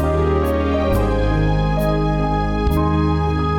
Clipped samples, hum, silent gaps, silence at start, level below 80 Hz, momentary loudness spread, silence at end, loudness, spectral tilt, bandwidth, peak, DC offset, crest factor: under 0.1%; none; none; 0 s; -22 dBFS; 1 LU; 0 s; -18 LUFS; -8 dB/octave; 17.5 kHz; -8 dBFS; under 0.1%; 10 dB